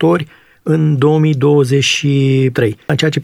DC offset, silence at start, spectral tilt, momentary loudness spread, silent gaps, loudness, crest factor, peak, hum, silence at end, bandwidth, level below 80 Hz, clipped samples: under 0.1%; 0 s; -6 dB/octave; 6 LU; none; -13 LUFS; 12 dB; -2 dBFS; none; 0 s; 13 kHz; -54 dBFS; under 0.1%